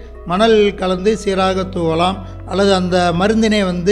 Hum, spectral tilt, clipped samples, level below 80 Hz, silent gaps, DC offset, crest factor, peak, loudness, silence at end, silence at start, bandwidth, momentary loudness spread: none; -5.5 dB/octave; under 0.1%; -34 dBFS; none; under 0.1%; 14 dB; -2 dBFS; -15 LUFS; 0 s; 0 s; 11 kHz; 6 LU